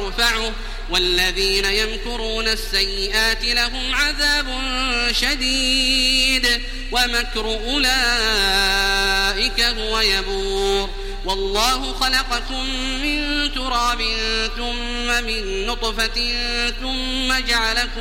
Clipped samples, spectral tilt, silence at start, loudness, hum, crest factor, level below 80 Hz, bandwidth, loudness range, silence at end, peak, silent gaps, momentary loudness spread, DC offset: under 0.1%; -1.5 dB/octave; 0 s; -18 LUFS; none; 18 dB; -28 dBFS; 16.5 kHz; 4 LU; 0 s; -2 dBFS; none; 7 LU; 0.3%